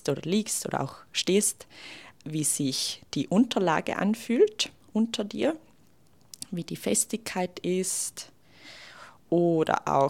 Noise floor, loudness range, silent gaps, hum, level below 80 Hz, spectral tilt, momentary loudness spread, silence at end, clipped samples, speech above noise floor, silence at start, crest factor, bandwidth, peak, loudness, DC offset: -62 dBFS; 5 LU; none; none; -70 dBFS; -4 dB/octave; 19 LU; 0 s; under 0.1%; 35 dB; 0.05 s; 22 dB; 16.5 kHz; -6 dBFS; -27 LUFS; 0.1%